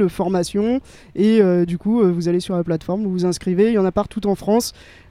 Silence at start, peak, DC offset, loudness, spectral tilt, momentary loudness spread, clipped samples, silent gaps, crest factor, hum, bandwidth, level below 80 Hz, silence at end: 0 s; -2 dBFS; under 0.1%; -19 LUFS; -6.5 dB/octave; 7 LU; under 0.1%; none; 16 dB; none; 15.5 kHz; -46 dBFS; 0.4 s